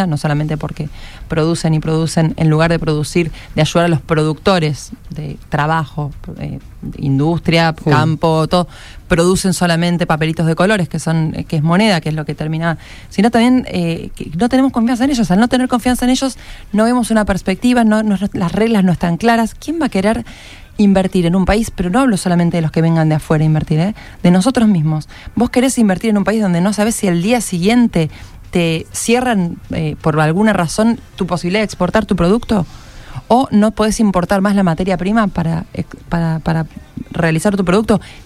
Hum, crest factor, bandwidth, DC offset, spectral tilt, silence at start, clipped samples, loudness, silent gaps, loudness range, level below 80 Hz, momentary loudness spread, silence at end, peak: none; 14 dB; 15 kHz; under 0.1%; -6 dB/octave; 0 s; under 0.1%; -15 LUFS; none; 2 LU; -34 dBFS; 10 LU; 0.05 s; 0 dBFS